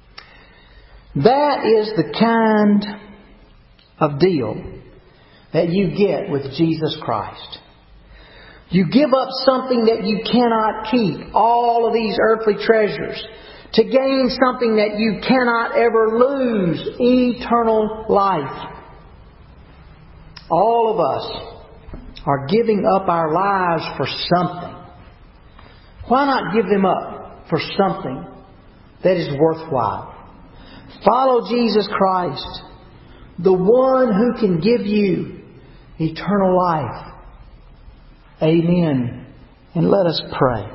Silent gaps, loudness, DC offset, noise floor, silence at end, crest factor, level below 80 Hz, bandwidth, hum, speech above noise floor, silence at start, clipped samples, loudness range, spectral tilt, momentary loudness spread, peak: none; -18 LUFS; under 0.1%; -49 dBFS; 0 s; 18 dB; -46 dBFS; 5.8 kHz; none; 32 dB; 0.95 s; under 0.1%; 5 LU; -11 dB/octave; 14 LU; 0 dBFS